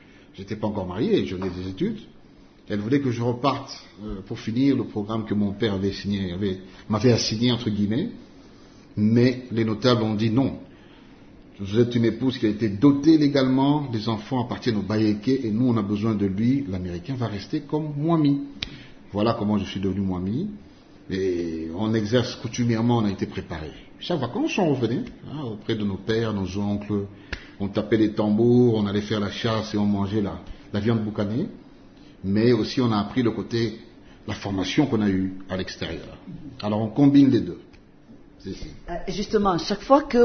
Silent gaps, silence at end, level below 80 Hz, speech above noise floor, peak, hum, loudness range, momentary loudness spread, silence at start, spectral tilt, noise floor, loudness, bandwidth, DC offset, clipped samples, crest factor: none; 0 s; -50 dBFS; 27 dB; -2 dBFS; none; 5 LU; 14 LU; 0.35 s; -7 dB/octave; -50 dBFS; -24 LUFS; 6.6 kHz; under 0.1%; under 0.1%; 20 dB